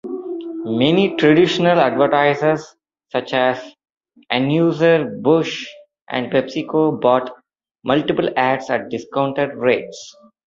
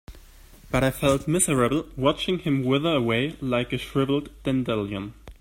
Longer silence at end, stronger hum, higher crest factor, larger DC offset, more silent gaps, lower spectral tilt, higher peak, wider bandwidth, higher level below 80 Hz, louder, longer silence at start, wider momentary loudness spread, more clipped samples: first, 0.35 s vs 0.05 s; neither; about the same, 16 dB vs 18 dB; neither; neither; about the same, -6 dB/octave vs -5 dB/octave; first, -2 dBFS vs -6 dBFS; second, 7.6 kHz vs 16.5 kHz; second, -60 dBFS vs -44 dBFS; first, -18 LUFS vs -24 LUFS; about the same, 0.05 s vs 0.1 s; first, 13 LU vs 6 LU; neither